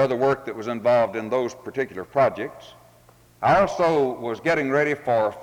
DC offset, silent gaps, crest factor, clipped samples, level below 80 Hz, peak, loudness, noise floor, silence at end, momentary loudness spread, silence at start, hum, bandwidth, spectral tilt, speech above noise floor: under 0.1%; none; 16 dB; under 0.1%; -56 dBFS; -8 dBFS; -23 LUFS; -54 dBFS; 0 s; 10 LU; 0 s; none; 18.5 kHz; -6 dB/octave; 32 dB